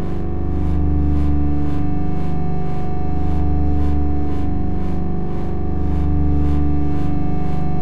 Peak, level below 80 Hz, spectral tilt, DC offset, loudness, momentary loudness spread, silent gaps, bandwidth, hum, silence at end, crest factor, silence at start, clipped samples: -6 dBFS; -22 dBFS; -10.5 dB/octave; 20%; -21 LUFS; 5 LU; none; 4.3 kHz; 50 Hz at -45 dBFS; 0 s; 12 dB; 0 s; under 0.1%